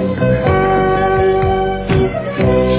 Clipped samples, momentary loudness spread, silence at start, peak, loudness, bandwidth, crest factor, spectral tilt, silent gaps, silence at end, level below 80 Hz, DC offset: under 0.1%; 3 LU; 0 s; 0 dBFS; -14 LUFS; 4 kHz; 12 dB; -11.5 dB/octave; none; 0 s; -26 dBFS; under 0.1%